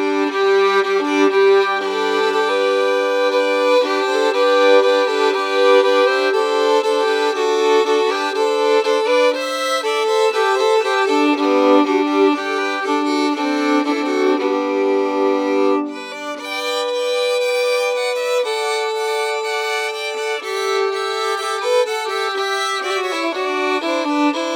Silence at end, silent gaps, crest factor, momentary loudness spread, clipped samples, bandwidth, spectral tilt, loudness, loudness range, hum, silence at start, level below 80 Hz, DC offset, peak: 0 s; none; 14 dB; 6 LU; under 0.1%; 18 kHz; -1.5 dB/octave; -17 LUFS; 5 LU; none; 0 s; -80 dBFS; under 0.1%; -2 dBFS